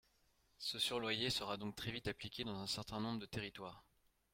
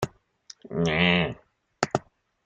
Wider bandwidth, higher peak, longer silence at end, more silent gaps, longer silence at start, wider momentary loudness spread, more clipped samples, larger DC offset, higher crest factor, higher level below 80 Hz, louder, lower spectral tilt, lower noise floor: first, 16.5 kHz vs 9.2 kHz; second, -24 dBFS vs -4 dBFS; about the same, 0.55 s vs 0.45 s; neither; first, 0.6 s vs 0 s; second, 9 LU vs 14 LU; neither; neither; about the same, 20 dB vs 24 dB; second, -68 dBFS vs -54 dBFS; second, -42 LUFS vs -26 LUFS; second, -3.5 dB/octave vs -5 dB/octave; first, -76 dBFS vs -52 dBFS